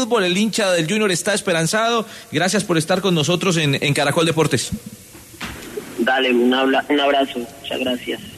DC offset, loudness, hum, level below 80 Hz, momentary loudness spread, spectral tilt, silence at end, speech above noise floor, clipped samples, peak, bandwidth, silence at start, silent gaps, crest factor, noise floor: under 0.1%; -18 LUFS; none; -52 dBFS; 13 LU; -4 dB/octave; 0 s; 20 dB; under 0.1%; -4 dBFS; 13.5 kHz; 0 s; none; 14 dB; -38 dBFS